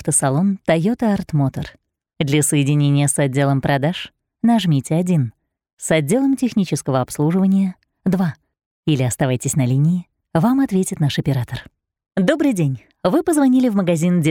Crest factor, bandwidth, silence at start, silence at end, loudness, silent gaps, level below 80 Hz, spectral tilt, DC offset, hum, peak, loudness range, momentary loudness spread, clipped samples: 18 dB; 16.5 kHz; 0 s; 0 s; -18 LUFS; 5.73-5.77 s, 8.66-8.83 s; -50 dBFS; -6 dB/octave; under 0.1%; none; 0 dBFS; 2 LU; 8 LU; under 0.1%